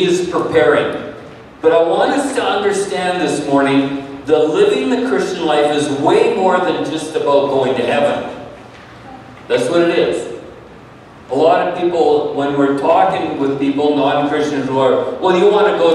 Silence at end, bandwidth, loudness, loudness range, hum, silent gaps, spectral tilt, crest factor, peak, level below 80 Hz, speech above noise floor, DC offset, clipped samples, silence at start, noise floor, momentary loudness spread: 0 s; 12 kHz; -15 LUFS; 3 LU; none; none; -5 dB/octave; 14 dB; 0 dBFS; -52 dBFS; 24 dB; under 0.1%; under 0.1%; 0 s; -38 dBFS; 10 LU